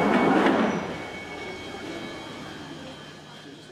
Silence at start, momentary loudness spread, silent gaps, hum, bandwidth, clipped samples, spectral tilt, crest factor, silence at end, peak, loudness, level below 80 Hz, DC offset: 0 s; 22 LU; none; none; 13.5 kHz; under 0.1%; -5.5 dB/octave; 18 dB; 0 s; -10 dBFS; -26 LUFS; -58 dBFS; under 0.1%